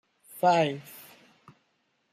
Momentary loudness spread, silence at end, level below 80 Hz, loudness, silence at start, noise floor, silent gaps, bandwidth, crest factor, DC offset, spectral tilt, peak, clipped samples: 24 LU; 1.1 s; -80 dBFS; -25 LUFS; 0.35 s; -73 dBFS; none; 15.5 kHz; 18 dB; under 0.1%; -5.5 dB/octave; -12 dBFS; under 0.1%